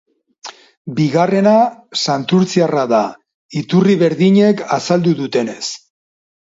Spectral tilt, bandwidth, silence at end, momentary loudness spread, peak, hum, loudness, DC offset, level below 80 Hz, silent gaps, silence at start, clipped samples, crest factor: -6 dB/octave; 7.8 kHz; 0.8 s; 18 LU; 0 dBFS; none; -15 LUFS; under 0.1%; -62 dBFS; 0.77-0.85 s, 3.34-3.49 s; 0.45 s; under 0.1%; 14 dB